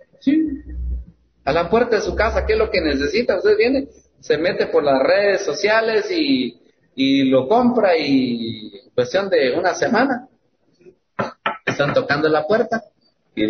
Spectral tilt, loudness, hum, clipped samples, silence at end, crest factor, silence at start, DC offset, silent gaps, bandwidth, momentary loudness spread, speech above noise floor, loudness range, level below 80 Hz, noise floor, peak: -5.5 dB/octave; -18 LUFS; none; under 0.1%; 0 s; 14 dB; 0.25 s; under 0.1%; none; 6.6 kHz; 12 LU; 44 dB; 4 LU; -38 dBFS; -62 dBFS; -6 dBFS